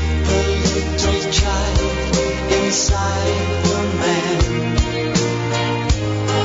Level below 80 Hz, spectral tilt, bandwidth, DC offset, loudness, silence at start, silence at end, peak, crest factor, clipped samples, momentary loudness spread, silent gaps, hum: -26 dBFS; -4.5 dB/octave; 7.8 kHz; under 0.1%; -18 LUFS; 0 s; 0 s; -4 dBFS; 12 dB; under 0.1%; 3 LU; none; none